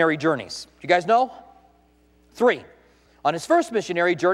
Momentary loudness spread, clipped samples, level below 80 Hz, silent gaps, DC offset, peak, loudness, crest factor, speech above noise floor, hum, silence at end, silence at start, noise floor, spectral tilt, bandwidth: 9 LU; under 0.1%; -62 dBFS; none; under 0.1%; -6 dBFS; -22 LUFS; 18 dB; 37 dB; none; 0 s; 0 s; -58 dBFS; -5 dB/octave; 13 kHz